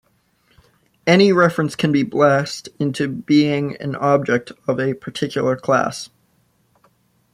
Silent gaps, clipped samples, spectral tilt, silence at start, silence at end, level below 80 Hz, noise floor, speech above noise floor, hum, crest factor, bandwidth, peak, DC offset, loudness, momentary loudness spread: none; under 0.1%; -6 dB/octave; 1.05 s; 1.25 s; -60 dBFS; -61 dBFS; 44 dB; none; 18 dB; 14 kHz; -2 dBFS; under 0.1%; -18 LUFS; 11 LU